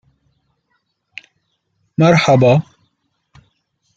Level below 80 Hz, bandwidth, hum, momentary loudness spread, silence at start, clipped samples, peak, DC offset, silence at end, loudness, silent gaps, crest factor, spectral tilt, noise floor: -54 dBFS; 7.8 kHz; none; 26 LU; 2 s; under 0.1%; -2 dBFS; under 0.1%; 1.35 s; -13 LUFS; none; 18 dB; -6.5 dB/octave; -68 dBFS